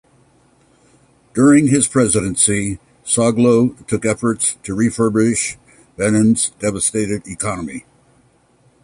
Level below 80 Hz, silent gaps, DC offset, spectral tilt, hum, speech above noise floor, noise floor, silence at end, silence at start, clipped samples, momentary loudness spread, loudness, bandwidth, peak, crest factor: -46 dBFS; none; under 0.1%; -4.5 dB/octave; none; 39 dB; -55 dBFS; 1.05 s; 1.35 s; under 0.1%; 12 LU; -16 LUFS; 11.5 kHz; -2 dBFS; 16 dB